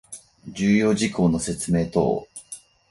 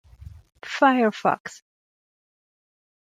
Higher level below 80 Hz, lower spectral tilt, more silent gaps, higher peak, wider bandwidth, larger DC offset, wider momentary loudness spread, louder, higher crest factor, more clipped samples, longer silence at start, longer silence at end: first, -48 dBFS vs -56 dBFS; about the same, -5.5 dB/octave vs -5 dB/octave; second, none vs 1.40-1.45 s; about the same, -6 dBFS vs -4 dBFS; about the same, 11.5 kHz vs 11 kHz; neither; about the same, 20 LU vs 21 LU; about the same, -22 LUFS vs -22 LUFS; about the same, 18 dB vs 22 dB; neither; about the same, 0.1 s vs 0.2 s; second, 0.3 s vs 1.55 s